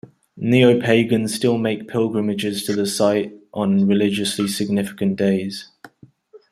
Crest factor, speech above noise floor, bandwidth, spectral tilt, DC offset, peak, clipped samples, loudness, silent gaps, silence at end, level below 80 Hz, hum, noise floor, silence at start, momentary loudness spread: 18 dB; 30 dB; 14.5 kHz; -5.5 dB/octave; under 0.1%; -2 dBFS; under 0.1%; -19 LUFS; none; 0.15 s; -60 dBFS; none; -48 dBFS; 0.35 s; 9 LU